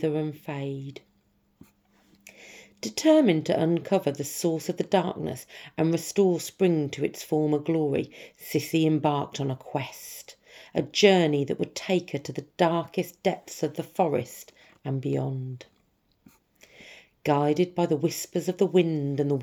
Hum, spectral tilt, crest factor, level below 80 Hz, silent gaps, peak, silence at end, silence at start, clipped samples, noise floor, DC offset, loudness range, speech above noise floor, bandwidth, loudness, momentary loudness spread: none; -5.5 dB/octave; 22 dB; -72 dBFS; none; -6 dBFS; 0 s; 0 s; under 0.1%; -68 dBFS; under 0.1%; 5 LU; 42 dB; 20 kHz; -26 LUFS; 16 LU